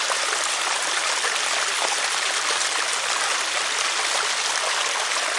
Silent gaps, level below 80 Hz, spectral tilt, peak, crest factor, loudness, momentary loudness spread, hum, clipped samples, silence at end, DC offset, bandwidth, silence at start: none; -74 dBFS; 2.5 dB/octave; -6 dBFS; 18 dB; -21 LUFS; 1 LU; none; under 0.1%; 0 s; under 0.1%; 11.5 kHz; 0 s